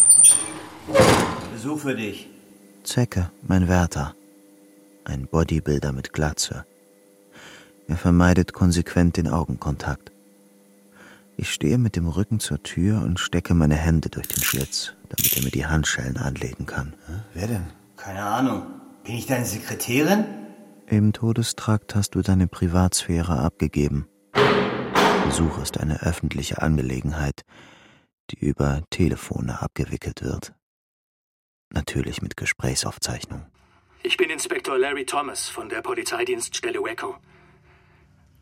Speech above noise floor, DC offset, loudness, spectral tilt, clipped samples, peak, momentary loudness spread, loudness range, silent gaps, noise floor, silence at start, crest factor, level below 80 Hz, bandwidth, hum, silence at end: 33 dB; under 0.1%; -23 LUFS; -4 dB/octave; under 0.1%; -4 dBFS; 13 LU; 6 LU; 28.13-28.28 s, 30.62-31.71 s; -56 dBFS; 0 s; 20 dB; -38 dBFS; 16.5 kHz; none; 1.25 s